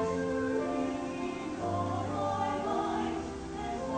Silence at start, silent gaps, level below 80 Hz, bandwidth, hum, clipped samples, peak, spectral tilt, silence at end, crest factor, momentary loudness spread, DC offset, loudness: 0 s; none; -54 dBFS; 9.4 kHz; none; under 0.1%; -20 dBFS; -6 dB/octave; 0 s; 14 dB; 5 LU; under 0.1%; -33 LUFS